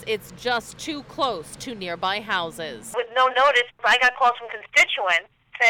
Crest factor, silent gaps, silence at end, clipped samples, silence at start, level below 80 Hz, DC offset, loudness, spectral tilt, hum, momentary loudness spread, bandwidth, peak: 14 dB; none; 0 s; under 0.1%; 0 s; -58 dBFS; under 0.1%; -21 LUFS; -1.5 dB/octave; none; 15 LU; 18.5 kHz; -8 dBFS